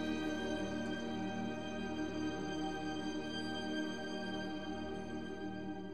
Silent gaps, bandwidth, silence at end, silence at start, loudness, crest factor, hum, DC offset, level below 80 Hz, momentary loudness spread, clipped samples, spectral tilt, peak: none; 13 kHz; 0 s; 0 s; -41 LUFS; 14 dB; none; 0.2%; -62 dBFS; 5 LU; under 0.1%; -5 dB/octave; -26 dBFS